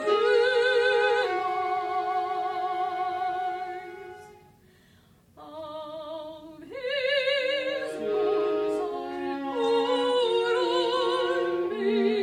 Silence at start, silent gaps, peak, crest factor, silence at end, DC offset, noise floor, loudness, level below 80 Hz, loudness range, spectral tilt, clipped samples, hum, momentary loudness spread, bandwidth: 0 s; none; -12 dBFS; 14 dB; 0 s; under 0.1%; -59 dBFS; -26 LUFS; -70 dBFS; 11 LU; -3.5 dB/octave; under 0.1%; none; 17 LU; 10.5 kHz